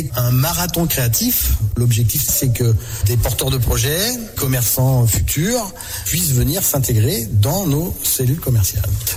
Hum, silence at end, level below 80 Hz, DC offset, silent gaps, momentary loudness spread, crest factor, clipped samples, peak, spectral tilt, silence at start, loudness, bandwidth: none; 0 s; -28 dBFS; under 0.1%; none; 4 LU; 10 dB; under 0.1%; -6 dBFS; -4.5 dB/octave; 0 s; -17 LUFS; 19 kHz